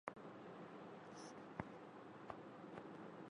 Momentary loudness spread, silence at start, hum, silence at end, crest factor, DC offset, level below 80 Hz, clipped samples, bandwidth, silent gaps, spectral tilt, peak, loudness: 4 LU; 0.05 s; none; 0 s; 28 dB; under 0.1%; -80 dBFS; under 0.1%; 11 kHz; none; -6 dB/octave; -26 dBFS; -56 LUFS